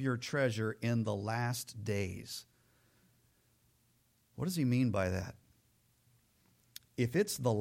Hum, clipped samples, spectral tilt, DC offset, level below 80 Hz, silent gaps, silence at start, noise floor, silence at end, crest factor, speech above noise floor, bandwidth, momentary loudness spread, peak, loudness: none; under 0.1%; -6 dB/octave; under 0.1%; -68 dBFS; none; 0 s; -73 dBFS; 0 s; 18 dB; 39 dB; 16.5 kHz; 15 LU; -20 dBFS; -35 LUFS